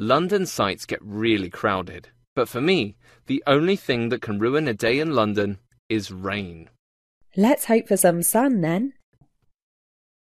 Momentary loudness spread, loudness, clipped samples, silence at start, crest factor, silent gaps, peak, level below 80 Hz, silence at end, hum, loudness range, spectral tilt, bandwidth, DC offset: 11 LU; -22 LUFS; under 0.1%; 0 s; 18 dB; 2.27-2.36 s, 5.79-5.90 s, 6.79-7.21 s; -4 dBFS; -58 dBFS; 1.45 s; none; 2 LU; -4.5 dB/octave; 14 kHz; under 0.1%